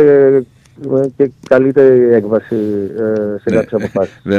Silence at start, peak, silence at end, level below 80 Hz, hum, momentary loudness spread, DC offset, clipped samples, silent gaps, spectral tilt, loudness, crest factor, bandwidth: 0 s; 0 dBFS; 0 s; -52 dBFS; none; 9 LU; under 0.1%; under 0.1%; none; -8.5 dB/octave; -13 LUFS; 12 dB; 7 kHz